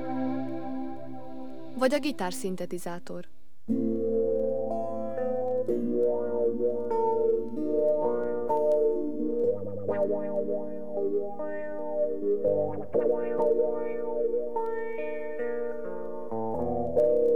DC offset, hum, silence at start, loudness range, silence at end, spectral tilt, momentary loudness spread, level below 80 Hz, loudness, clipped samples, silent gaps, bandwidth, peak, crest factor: 2%; none; 0 s; 5 LU; 0 s; -6.5 dB/octave; 11 LU; -64 dBFS; -29 LUFS; under 0.1%; none; 18 kHz; -10 dBFS; 18 dB